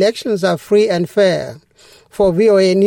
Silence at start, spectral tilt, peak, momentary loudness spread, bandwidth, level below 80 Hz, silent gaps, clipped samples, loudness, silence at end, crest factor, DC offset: 0 s; -6 dB/octave; -2 dBFS; 10 LU; 17 kHz; -48 dBFS; none; under 0.1%; -14 LUFS; 0 s; 12 dB; under 0.1%